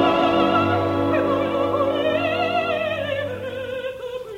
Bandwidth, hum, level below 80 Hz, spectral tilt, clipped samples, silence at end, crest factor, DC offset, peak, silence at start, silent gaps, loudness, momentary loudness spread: 16 kHz; none; -54 dBFS; -6.5 dB/octave; under 0.1%; 0 s; 16 dB; under 0.1%; -6 dBFS; 0 s; none; -21 LUFS; 11 LU